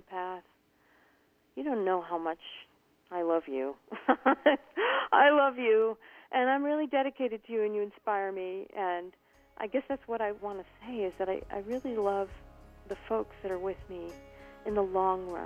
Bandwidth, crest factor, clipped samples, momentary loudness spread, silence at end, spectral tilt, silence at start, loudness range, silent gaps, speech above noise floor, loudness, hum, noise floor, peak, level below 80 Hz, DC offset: 8 kHz; 22 dB; under 0.1%; 16 LU; 0 s; -6 dB/octave; 0.1 s; 9 LU; none; 37 dB; -31 LUFS; none; -68 dBFS; -10 dBFS; -62 dBFS; under 0.1%